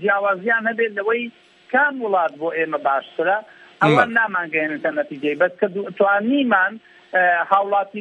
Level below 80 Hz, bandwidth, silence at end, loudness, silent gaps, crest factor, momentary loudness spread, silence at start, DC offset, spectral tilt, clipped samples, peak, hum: -72 dBFS; 9 kHz; 0 s; -19 LUFS; none; 18 dB; 7 LU; 0 s; under 0.1%; -6.5 dB/octave; under 0.1%; -2 dBFS; none